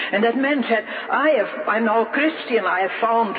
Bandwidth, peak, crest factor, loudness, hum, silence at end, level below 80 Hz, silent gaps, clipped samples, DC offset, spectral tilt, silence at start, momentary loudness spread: 4.9 kHz; -6 dBFS; 14 dB; -20 LUFS; none; 0 s; -74 dBFS; none; under 0.1%; under 0.1%; -8 dB/octave; 0 s; 3 LU